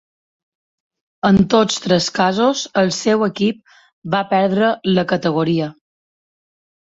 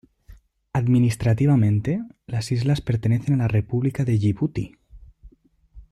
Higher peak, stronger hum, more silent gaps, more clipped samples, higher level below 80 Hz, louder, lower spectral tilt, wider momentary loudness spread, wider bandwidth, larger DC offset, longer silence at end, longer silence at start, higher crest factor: first, -2 dBFS vs -10 dBFS; neither; first, 3.93-4.02 s vs none; neither; about the same, -50 dBFS vs -46 dBFS; first, -17 LUFS vs -22 LUFS; second, -5 dB/octave vs -8 dB/octave; second, 7 LU vs 10 LU; second, 8 kHz vs 12 kHz; neither; first, 1.2 s vs 0.1 s; first, 1.25 s vs 0.3 s; about the same, 16 dB vs 14 dB